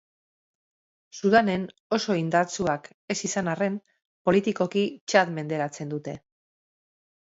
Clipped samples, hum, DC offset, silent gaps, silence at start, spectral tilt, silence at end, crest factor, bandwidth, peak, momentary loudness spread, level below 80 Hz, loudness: under 0.1%; none; under 0.1%; 1.80-1.90 s, 2.94-3.08 s, 4.05-4.25 s, 5.01-5.07 s; 1.15 s; -5 dB/octave; 1.05 s; 22 dB; 8 kHz; -4 dBFS; 12 LU; -64 dBFS; -26 LUFS